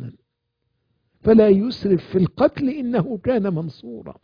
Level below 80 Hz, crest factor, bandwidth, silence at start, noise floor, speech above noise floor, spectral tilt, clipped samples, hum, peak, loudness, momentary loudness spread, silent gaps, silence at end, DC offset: -50 dBFS; 18 dB; 5.2 kHz; 0 s; -75 dBFS; 56 dB; -9.5 dB/octave; under 0.1%; none; -2 dBFS; -19 LUFS; 18 LU; none; 0.1 s; under 0.1%